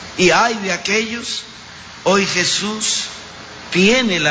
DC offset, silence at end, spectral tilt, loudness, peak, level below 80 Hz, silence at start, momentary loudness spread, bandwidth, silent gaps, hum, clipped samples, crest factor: under 0.1%; 0 s; -3 dB/octave; -16 LUFS; -2 dBFS; -50 dBFS; 0 s; 20 LU; 8 kHz; none; none; under 0.1%; 16 dB